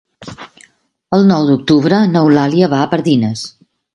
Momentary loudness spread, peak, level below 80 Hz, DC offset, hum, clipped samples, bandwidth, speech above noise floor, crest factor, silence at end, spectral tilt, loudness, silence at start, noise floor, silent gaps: 19 LU; 0 dBFS; -52 dBFS; under 0.1%; none; under 0.1%; 11 kHz; 40 dB; 12 dB; 0.45 s; -7 dB/octave; -12 LUFS; 0.2 s; -51 dBFS; none